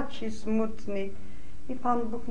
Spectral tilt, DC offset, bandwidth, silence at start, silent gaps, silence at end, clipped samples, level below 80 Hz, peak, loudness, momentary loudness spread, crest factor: -6.5 dB/octave; 5%; 10.5 kHz; 0 s; none; 0 s; under 0.1%; -50 dBFS; -14 dBFS; -32 LUFS; 18 LU; 18 dB